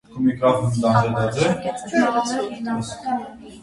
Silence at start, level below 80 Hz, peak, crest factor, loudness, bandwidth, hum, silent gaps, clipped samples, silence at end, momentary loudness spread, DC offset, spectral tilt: 0.1 s; -52 dBFS; -4 dBFS; 18 dB; -21 LUFS; 11.5 kHz; none; none; under 0.1%; 0 s; 8 LU; under 0.1%; -6 dB/octave